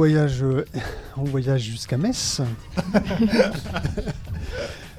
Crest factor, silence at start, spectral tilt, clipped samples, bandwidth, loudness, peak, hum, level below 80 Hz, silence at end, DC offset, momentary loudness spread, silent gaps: 18 dB; 0 s; -5.5 dB/octave; under 0.1%; 15 kHz; -24 LUFS; -4 dBFS; none; -38 dBFS; 0 s; under 0.1%; 12 LU; none